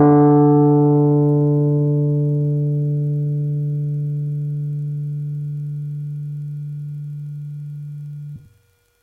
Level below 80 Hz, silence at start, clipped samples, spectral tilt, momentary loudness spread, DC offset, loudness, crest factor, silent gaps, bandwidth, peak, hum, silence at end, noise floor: -60 dBFS; 0 s; under 0.1%; -13 dB/octave; 18 LU; under 0.1%; -19 LUFS; 14 dB; none; 2 kHz; -4 dBFS; none; 0.65 s; -59 dBFS